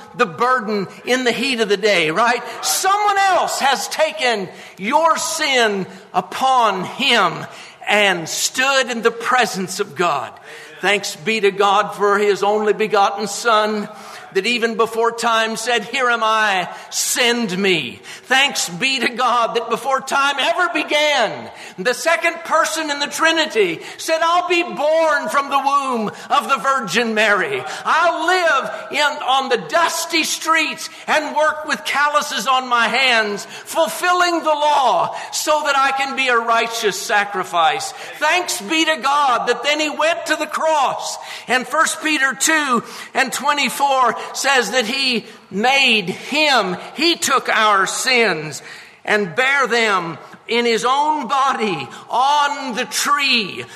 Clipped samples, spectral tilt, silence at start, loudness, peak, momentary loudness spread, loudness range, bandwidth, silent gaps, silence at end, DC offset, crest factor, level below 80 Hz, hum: under 0.1%; -2 dB/octave; 0 s; -17 LUFS; 0 dBFS; 8 LU; 2 LU; 13.5 kHz; none; 0 s; under 0.1%; 16 dB; -70 dBFS; none